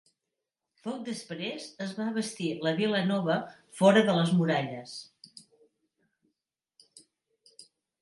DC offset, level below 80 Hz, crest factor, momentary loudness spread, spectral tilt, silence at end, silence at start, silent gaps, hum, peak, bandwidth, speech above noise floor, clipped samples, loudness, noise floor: under 0.1%; -78 dBFS; 22 dB; 19 LU; -6 dB/octave; 0.4 s; 0.85 s; none; none; -8 dBFS; 11.5 kHz; 58 dB; under 0.1%; -28 LUFS; -87 dBFS